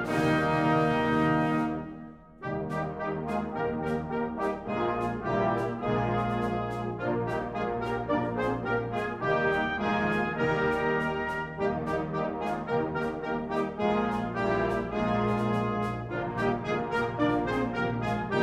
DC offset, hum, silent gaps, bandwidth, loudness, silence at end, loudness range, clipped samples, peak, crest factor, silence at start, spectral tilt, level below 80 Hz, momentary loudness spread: under 0.1%; none; none; 13 kHz; -29 LUFS; 0 s; 2 LU; under 0.1%; -14 dBFS; 16 dB; 0 s; -7.5 dB/octave; -50 dBFS; 7 LU